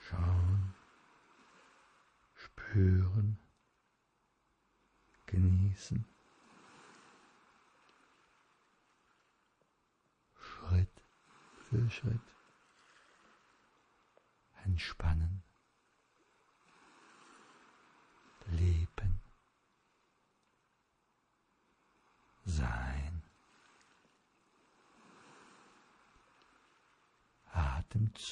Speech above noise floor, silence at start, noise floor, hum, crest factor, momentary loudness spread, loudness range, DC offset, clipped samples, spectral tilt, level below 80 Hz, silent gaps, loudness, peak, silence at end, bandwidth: 46 dB; 0 s; -78 dBFS; none; 18 dB; 23 LU; 10 LU; under 0.1%; under 0.1%; -7 dB/octave; -50 dBFS; none; -35 LUFS; -20 dBFS; 0 s; 9.4 kHz